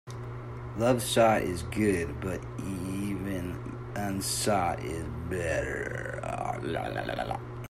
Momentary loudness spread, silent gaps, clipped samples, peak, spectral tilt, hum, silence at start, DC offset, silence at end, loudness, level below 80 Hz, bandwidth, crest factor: 12 LU; none; under 0.1%; -10 dBFS; -5 dB/octave; none; 0.05 s; under 0.1%; 0 s; -31 LUFS; -48 dBFS; 16 kHz; 20 dB